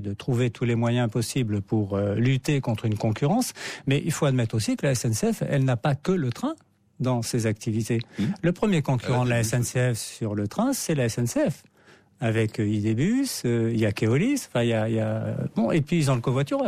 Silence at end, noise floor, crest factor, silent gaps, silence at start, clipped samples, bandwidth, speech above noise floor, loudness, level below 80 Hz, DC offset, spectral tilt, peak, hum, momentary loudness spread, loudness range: 0 s; -56 dBFS; 12 dB; none; 0 s; under 0.1%; 15.5 kHz; 32 dB; -25 LUFS; -54 dBFS; under 0.1%; -6 dB/octave; -12 dBFS; none; 5 LU; 2 LU